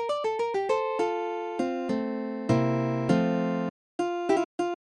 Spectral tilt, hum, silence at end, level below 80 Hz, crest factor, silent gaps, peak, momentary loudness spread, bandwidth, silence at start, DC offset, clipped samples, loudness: -7 dB/octave; none; 0.1 s; -64 dBFS; 18 dB; 3.70-3.99 s, 4.45-4.58 s; -10 dBFS; 7 LU; 11 kHz; 0 s; under 0.1%; under 0.1%; -28 LUFS